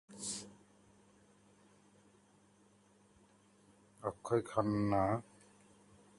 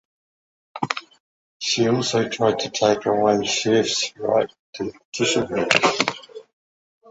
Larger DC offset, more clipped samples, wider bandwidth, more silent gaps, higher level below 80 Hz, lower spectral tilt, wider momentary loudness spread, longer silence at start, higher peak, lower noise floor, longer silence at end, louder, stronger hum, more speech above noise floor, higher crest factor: neither; neither; first, 11.5 kHz vs 9.8 kHz; second, none vs 1.20-1.60 s, 4.59-4.73 s, 5.05-5.12 s; second, -66 dBFS vs -60 dBFS; first, -6 dB/octave vs -3.5 dB/octave; about the same, 12 LU vs 12 LU; second, 0.1 s vs 0.75 s; second, -18 dBFS vs 0 dBFS; second, -68 dBFS vs under -90 dBFS; first, 0.95 s vs 0.7 s; second, -37 LUFS vs -21 LUFS; neither; second, 33 dB vs over 69 dB; about the same, 24 dB vs 22 dB